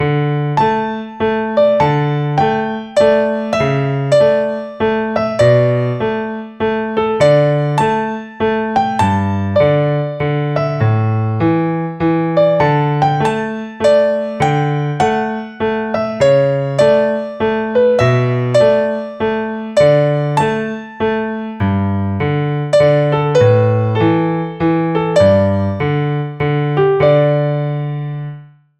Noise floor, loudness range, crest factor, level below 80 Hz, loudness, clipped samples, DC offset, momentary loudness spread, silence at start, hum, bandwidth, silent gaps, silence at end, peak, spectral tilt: -34 dBFS; 2 LU; 14 dB; -46 dBFS; -15 LUFS; under 0.1%; under 0.1%; 8 LU; 0 s; none; 10 kHz; none; 0.35 s; 0 dBFS; -7.5 dB/octave